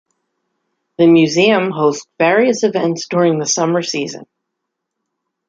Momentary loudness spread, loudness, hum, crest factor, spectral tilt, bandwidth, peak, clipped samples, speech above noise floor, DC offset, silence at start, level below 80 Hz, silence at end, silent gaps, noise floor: 9 LU; -14 LUFS; none; 14 dB; -4.5 dB/octave; 7.6 kHz; -2 dBFS; under 0.1%; 63 dB; under 0.1%; 1 s; -62 dBFS; 1.25 s; none; -77 dBFS